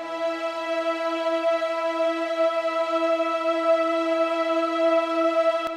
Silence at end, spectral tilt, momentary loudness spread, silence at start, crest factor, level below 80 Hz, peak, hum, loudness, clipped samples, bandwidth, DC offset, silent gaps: 0 s; -2.5 dB/octave; 5 LU; 0 s; 12 dB; -72 dBFS; -12 dBFS; none; -24 LUFS; under 0.1%; 10.5 kHz; under 0.1%; none